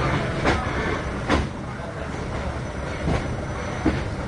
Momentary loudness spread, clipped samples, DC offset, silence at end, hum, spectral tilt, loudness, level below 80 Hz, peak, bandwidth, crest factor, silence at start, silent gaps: 8 LU; under 0.1%; under 0.1%; 0 s; none; -6 dB/octave; -26 LUFS; -34 dBFS; -8 dBFS; 11 kHz; 18 dB; 0 s; none